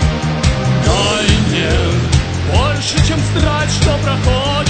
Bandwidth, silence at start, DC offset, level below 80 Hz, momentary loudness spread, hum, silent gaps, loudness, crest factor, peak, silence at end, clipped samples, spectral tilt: 9.2 kHz; 0 s; under 0.1%; -20 dBFS; 3 LU; none; none; -14 LUFS; 14 dB; 0 dBFS; 0 s; under 0.1%; -5 dB/octave